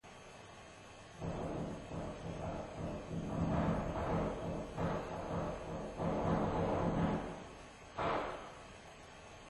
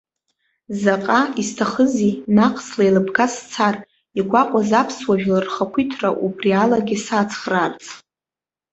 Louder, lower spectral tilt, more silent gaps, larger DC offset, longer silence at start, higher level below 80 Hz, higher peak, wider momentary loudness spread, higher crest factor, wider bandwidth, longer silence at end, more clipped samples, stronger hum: second, -39 LUFS vs -19 LUFS; first, -7 dB/octave vs -5.5 dB/octave; neither; neither; second, 0.05 s vs 0.7 s; first, -52 dBFS vs -58 dBFS; second, -22 dBFS vs -2 dBFS; first, 18 LU vs 6 LU; about the same, 18 dB vs 18 dB; first, 12 kHz vs 8.2 kHz; second, 0 s vs 0.75 s; neither; neither